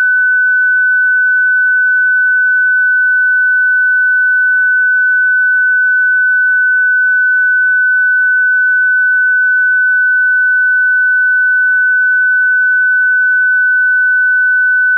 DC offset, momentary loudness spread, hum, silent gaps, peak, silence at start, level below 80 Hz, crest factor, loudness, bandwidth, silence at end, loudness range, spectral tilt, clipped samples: under 0.1%; 0 LU; none; none; -6 dBFS; 0 s; under -90 dBFS; 4 dB; -9 LUFS; 1.7 kHz; 0 s; 0 LU; 8.5 dB/octave; under 0.1%